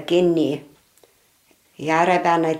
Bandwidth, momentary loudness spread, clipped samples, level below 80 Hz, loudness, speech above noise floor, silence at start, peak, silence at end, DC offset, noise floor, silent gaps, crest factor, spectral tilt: 13.5 kHz; 12 LU; under 0.1%; -68 dBFS; -20 LUFS; 41 dB; 0 s; -4 dBFS; 0 s; under 0.1%; -59 dBFS; none; 16 dB; -6 dB/octave